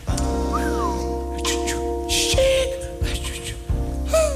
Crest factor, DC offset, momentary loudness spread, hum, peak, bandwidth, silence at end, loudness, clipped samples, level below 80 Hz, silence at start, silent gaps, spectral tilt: 16 dB; under 0.1%; 9 LU; none; -6 dBFS; 15.5 kHz; 0 s; -23 LUFS; under 0.1%; -28 dBFS; 0 s; none; -4 dB/octave